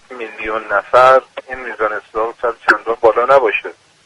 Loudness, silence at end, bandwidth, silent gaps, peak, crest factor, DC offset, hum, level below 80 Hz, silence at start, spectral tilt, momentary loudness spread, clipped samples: -14 LUFS; 0.35 s; 11 kHz; none; 0 dBFS; 16 dB; under 0.1%; none; -50 dBFS; 0.1 s; -4 dB/octave; 16 LU; under 0.1%